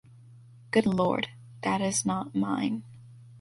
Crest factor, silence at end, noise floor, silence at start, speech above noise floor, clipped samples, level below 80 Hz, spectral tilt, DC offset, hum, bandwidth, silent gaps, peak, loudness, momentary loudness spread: 20 dB; 0 s; -52 dBFS; 0.3 s; 25 dB; under 0.1%; -62 dBFS; -4.5 dB/octave; under 0.1%; none; 11.5 kHz; none; -10 dBFS; -29 LUFS; 8 LU